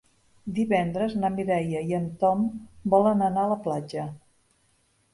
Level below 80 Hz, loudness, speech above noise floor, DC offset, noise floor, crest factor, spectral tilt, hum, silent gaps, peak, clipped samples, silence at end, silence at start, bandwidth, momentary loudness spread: -58 dBFS; -26 LUFS; 42 dB; under 0.1%; -67 dBFS; 18 dB; -8 dB/octave; none; none; -8 dBFS; under 0.1%; 0.95 s; 0.45 s; 11.5 kHz; 12 LU